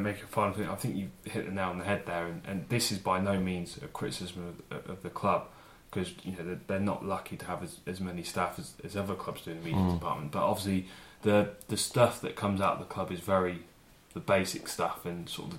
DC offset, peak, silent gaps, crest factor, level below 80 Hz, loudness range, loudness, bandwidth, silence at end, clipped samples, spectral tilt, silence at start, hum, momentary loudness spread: under 0.1%; -10 dBFS; none; 22 dB; -58 dBFS; 6 LU; -33 LUFS; 16.5 kHz; 0 s; under 0.1%; -5 dB/octave; 0 s; none; 12 LU